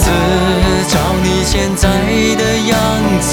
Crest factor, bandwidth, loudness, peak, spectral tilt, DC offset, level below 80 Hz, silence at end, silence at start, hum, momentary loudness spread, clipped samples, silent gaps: 12 dB; over 20 kHz; -13 LUFS; 0 dBFS; -4.5 dB/octave; under 0.1%; -22 dBFS; 0 s; 0 s; none; 1 LU; under 0.1%; none